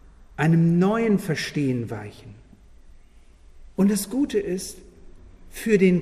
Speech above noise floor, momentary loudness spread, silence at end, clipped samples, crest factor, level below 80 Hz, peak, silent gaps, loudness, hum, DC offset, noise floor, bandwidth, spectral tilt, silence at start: 28 dB; 18 LU; 0 s; under 0.1%; 18 dB; -48 dBFS; -6 dBFS; none; -23 LUFS; none; under 0.1%; -50 dBFS; 15 kHz; -6.5 dB/octave; 0.4 s